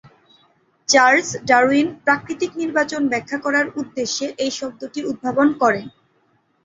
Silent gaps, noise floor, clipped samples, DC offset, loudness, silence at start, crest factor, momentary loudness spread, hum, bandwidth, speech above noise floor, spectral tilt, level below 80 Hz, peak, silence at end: none; -62 dBFS; under 0.1%; under 0.1%; -19 LUFS; 0.9 s; 18 dB; 12 LU; none; 7.8 kHz; 44 dB; -3 dB/octave; -62 dBFS; -2 dBFS; 0.75 s